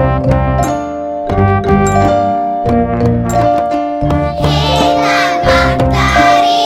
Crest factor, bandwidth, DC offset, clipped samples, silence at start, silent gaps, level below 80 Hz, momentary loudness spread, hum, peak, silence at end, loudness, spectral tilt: 12 dB; 16 kHz; under 0.1%; under 0.1%; 0 s; none; -24 dBFS; 6 LU; none; 0 dBFS; 0 s; -12 LUFS; -6 dB/octave